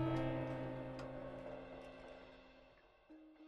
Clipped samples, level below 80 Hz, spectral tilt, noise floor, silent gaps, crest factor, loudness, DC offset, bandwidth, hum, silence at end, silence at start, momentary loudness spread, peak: under 0.1%; -62 dBFS; -8 dB/octave; -67 dBFS; none; 18 dB; -46 LUFS; under 0.1%; 8 kHz; none; 0 s; 0 s; 22 LU; -28 dBFS